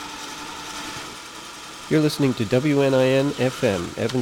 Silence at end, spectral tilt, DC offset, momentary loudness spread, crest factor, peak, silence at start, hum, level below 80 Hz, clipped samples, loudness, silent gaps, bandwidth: 0 s; -5.5 dB/octave; under 0.1%; 17 LU; 16 dB; -6 dBFS; 0 s; none; -54 dBFS; under 0.1%; -22 LUFS; none; 17 kHz